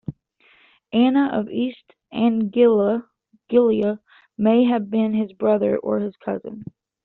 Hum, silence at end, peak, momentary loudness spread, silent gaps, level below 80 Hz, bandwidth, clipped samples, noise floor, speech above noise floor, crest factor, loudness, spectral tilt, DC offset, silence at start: none; 0.4 s; -4 dBFS; 13 LU; none; -62 dBFS; 4.2 kHz; under 0.1%; -58 dBFS; 38 dB; 16 dB; -20 LUFS; -6 dB/octave; under 0.1%; 0.1 s